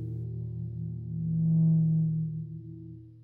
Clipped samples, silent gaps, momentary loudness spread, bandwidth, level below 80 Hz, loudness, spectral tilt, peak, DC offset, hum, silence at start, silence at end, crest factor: under 0.1%; none; 19 LU; 0.9 kHz; -54 dBFS; -29 LUFS; -15 dB/octave; -18 dBFS; under 0.1%; 60 Hz at -65 dBFS; 0 s; 0 s; 12 dB